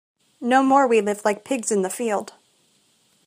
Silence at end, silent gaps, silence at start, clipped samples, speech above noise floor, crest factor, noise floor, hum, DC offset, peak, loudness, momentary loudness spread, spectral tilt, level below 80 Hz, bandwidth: 1.05 s; none; 0.4 s; under 0.1%; 42 dB; 20 dB; -62 dBFS; none; under 0.1%; -4 dBFS; -21 LUFS; 11 LU; -4 dB/octave; -74 dBFS; 15.5 kHz